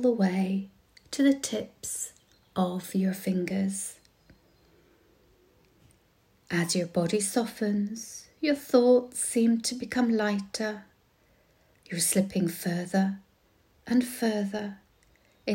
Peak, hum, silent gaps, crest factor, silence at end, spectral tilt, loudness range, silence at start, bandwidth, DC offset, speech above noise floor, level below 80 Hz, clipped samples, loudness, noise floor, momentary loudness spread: -10 dBFS; none; none; 20 dB; 0 s; -5 dB/octave; 7 LU; 0 s; 16.5 kHz; under 0.1%; 38 dB; -68 dBFS; under 0.1%; -28 LUFS; -65 dBFS; 13 LU